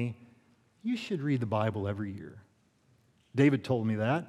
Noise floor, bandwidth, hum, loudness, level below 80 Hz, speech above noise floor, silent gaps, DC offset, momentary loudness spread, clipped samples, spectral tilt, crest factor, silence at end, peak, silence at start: -68 dBFS; 11.5 kHz; none; -31 LUFS; -76 dBFS; 38 dB; none; under 0.1%; 15 LU; under 0.1%; -8 dB/octave; 20 dB; 0 s; -12 dBFS; 0 s